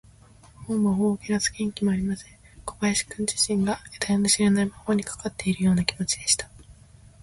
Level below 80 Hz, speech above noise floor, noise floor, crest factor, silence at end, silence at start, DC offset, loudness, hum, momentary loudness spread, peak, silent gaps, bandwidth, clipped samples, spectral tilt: -50 dBFS; 27 dB; -52 dBFS; 20 dB; 0.5 s; 0.6 s; under 0.1%; -24 LUFS; none; 10 LU; -6 dBFS; none; 12 kHz; under 0.1%; -4 dB/octave